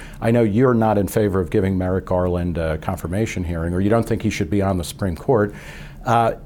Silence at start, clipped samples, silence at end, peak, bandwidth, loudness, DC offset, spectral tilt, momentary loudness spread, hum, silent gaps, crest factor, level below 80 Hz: 0 s; under 0.1%; 0 s; -4 dBFS; 18 kHz; -20 LUFS; under 0.1%; -7 dB/octave; 9 LU; none; none; 16 dB; -38 dBFS